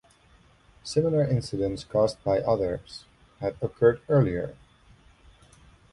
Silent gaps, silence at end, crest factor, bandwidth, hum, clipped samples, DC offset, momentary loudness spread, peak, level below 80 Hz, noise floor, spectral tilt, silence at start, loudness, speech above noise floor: none; 1.4 s; 20 dB; 11.5 kHz; none; under 0.1%; under 0.1%; 13 LU; -8 dBFS; -50 dBFS; -58 dBFS; -7 dB/octave; 0.85 s; -26 LUFS; 33 dB